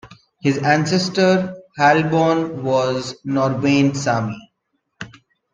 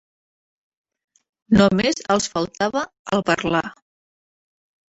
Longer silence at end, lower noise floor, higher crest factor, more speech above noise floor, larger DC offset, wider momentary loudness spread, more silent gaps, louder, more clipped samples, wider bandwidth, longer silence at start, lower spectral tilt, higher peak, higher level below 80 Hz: second, 0.45 s vs 1.15 s; second, -72 dBFS vs under -90 dBFS; about the same, 18 dB vs 22 dB; second, 55 dB vs over 70 dB; neither; first, 16 LU vs 8 LU; second, none vs 2.99-3.05 s; about the same, -18 LUFS vs -20 LUFS; neither; first, 9.8 kHz vs 8.2 kHz; second, 0.05 s vs 1.5 s; about the same, -5.5 dB/octave vs -5 dB/octave; about the same, -2 dBFS vs -2 dBFS; second, -58 dBFS vs -50 dBFS